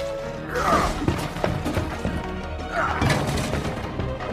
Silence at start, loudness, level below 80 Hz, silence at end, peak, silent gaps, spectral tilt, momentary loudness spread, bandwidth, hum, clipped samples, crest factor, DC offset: 0 s; -25 LUFS; -36 dBFS; 0 s; -6 dBFS; none; -5.5 dB/octave; 9 LU; 15.5 kHz; none; under 0.1%; 18 dB; under 0.1%